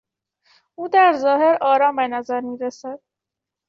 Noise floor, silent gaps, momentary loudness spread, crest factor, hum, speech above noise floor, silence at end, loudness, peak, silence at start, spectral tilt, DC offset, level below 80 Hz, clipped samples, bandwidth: -85 dBFS; none; 18 LU; 16 dB; none; 67 dB; 0.7 s; -18 LUFS; -4 dBFS; 0.8 s; -4 dB/octave; under 0.1%; -72 dBFS; under 0.1%; 7.2 kHz